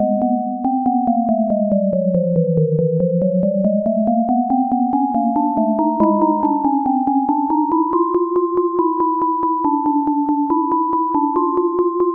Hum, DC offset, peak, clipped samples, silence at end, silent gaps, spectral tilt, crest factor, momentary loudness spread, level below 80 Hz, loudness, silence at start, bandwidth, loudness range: none; under 0.1%; -4 dBFS; under 0.1%; 0 s; none; -14 dB/octave; 12 dB; 1 LU; -54 dBFS; -17 LUFS; 0 s; 2.5 kHz; 1 LU